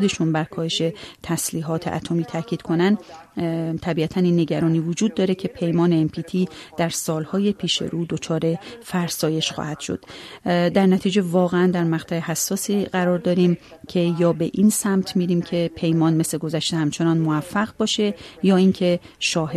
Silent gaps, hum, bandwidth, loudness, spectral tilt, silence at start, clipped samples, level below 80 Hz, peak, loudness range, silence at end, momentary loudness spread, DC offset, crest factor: none; none; 13.5 kHz; -22 LUFS; -5.5 dB/octave; 0 s; under 0.1%; -56 dBFS; -6 dBFS; 3 LU; 0 s; 8 LU; under 0.1%; 16 dB